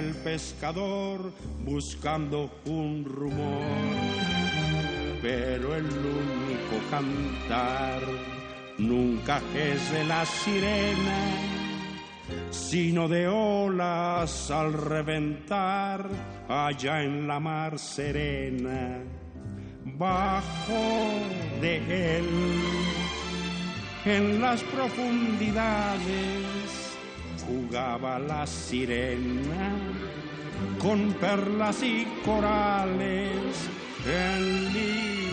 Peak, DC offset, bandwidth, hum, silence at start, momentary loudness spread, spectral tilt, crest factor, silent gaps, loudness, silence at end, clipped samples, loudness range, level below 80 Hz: -12 dBFS; under 0.1%; 9.4 kHz; none; 0 s; 9 LU; -5.5 dB/octave; 18 dB; none; -29 LUFS; 0 s; under 0.1%; 4 LU; -46 dBFS